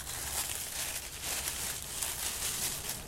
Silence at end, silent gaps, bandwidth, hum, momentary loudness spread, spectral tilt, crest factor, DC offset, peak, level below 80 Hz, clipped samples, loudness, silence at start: 0 s; none; 16 kHz; none; 3 LU; -0.5 dB/octave; 24 dB; under 0.1%; -14 dBFS; -52 dBFS; under 0.1%; -34 LUFS; 0 s